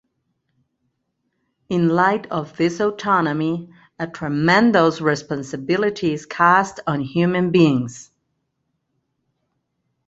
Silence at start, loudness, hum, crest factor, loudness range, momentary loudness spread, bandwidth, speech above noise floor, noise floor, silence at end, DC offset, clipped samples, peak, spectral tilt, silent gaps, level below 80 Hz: 1.7 s; -19 LUFS; none; 20 dB; 4 LU; 12 LU; 8 kHz; 55 dB; -73 dBFS; 2.05 s; under 0.1%; under 0.1%; -2 dBFS; -6.5 dB/octave; none; -58 dBFS